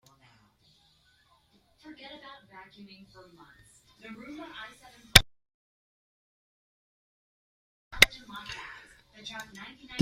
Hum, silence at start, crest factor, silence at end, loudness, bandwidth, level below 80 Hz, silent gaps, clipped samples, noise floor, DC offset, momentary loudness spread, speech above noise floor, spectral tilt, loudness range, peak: none; 4.1 s; 34 dB; 0 s; -21 LUFS; 16 kHz; -46 dBFS; 5.54-7.91 s; under 0.1%; -66 dBFS; under 0.1%; 29 LU; 18 dB; -1.5 dB/octave; 19 LU; 0 dBFS